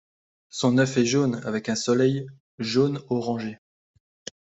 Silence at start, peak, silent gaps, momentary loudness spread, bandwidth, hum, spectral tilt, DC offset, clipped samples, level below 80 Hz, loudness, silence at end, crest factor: 0.55 s; -8 dBFS; 2.40-2.58 s; 16 LU; 8.2 kHz; none; -5.5 dB/octave; under 0.1%; under 0.1%; -64 dBFS; -24 LUFS; 0.9 s; 18 dB